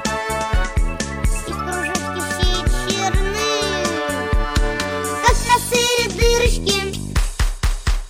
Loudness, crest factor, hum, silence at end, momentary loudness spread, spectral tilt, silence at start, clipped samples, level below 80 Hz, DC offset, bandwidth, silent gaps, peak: -19 LUFS; 16 dB; none; 0 s; 7 LU; -3.5 dB/octave; 0 s; under 0.1%; -22 dBFS; under 0.1%; 16 kHz; none; -2 dBFS